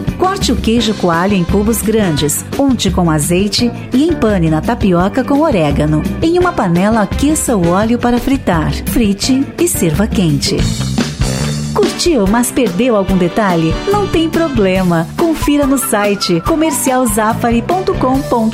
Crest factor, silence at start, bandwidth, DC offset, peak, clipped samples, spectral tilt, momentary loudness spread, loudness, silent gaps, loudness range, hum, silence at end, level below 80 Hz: 10 dB; 0 s; 16 kHz; 0.1%; -2 dBFS; under 0.1%; -5 dB/octave; 3 LU; -13 LUFS; none; 1 LU; none; 0 s; -26 dBFS